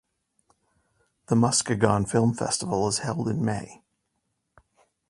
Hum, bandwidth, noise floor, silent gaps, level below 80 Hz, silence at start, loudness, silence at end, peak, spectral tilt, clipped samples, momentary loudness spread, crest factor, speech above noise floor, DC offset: none; 11.5 kHz; -77 dBFS; none; -56 dBFS; 1.3 s; -25 LUFS; 1.35 s; -4 dBFS; -5 dB/octave; under 0.1%; 7 LU; 24 dB; 53 dB; under 0.1%